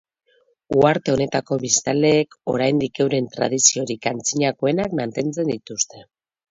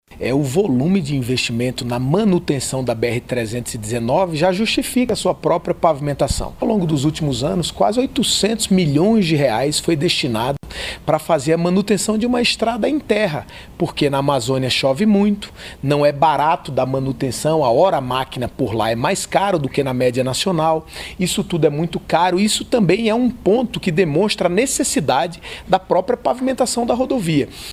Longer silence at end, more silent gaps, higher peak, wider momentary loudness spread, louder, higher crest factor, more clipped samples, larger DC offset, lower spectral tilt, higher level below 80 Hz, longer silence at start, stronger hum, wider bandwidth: first, 0.5 s vs 0 s; neither; about the same, 0 dBFS vs 0 dBFS; about the same, 9 LU vs 7 LU; about the same, -20 LUFS vs -18 LUFS; about the same, 20 dB vs 18 dB; neither; neither; second, -3.5 dB/octave vs -5 dB/octave; second, -56 dBFS vs -40 dBFS; first, 0.7 s vs 0.1 s; neither; second, 7.8 kHz vs 16 kHz